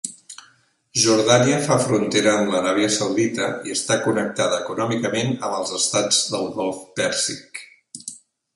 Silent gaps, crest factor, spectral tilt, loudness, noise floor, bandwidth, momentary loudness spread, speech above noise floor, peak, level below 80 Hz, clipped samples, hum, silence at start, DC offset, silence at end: none; 20 dB; -3.5 dB/octave; -20 LUFS; -58 dBFS; 11.5 kHz; 18 LU; 37 dB; 0 dBFS; -62 dBFS; under 0.1%; none; 0.05 s; under 0.1%; 0.4 s